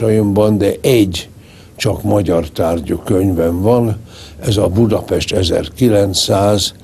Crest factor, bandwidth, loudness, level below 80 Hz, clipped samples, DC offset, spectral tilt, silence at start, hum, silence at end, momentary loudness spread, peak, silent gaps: 14 dB; 13.5 kHz; -14 LUFS; -36 dBFS; under 0.1%; under 0.1%; -5.5 dB/octave; 0 s; none; 0.1 s; 7 LU; 0 dBFS; none